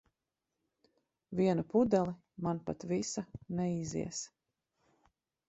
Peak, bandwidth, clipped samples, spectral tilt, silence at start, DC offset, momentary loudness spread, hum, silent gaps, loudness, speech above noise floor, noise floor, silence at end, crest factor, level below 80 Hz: -16 dBFS; 8.4 kHz; under 0.1%; -6 dB/octave; 1.3 s; under 0.1%; 12 LU; none; none; -35 LUFS; 55 dB; -88 dBFS; 1.2 s; 22 dB; -66 dBFS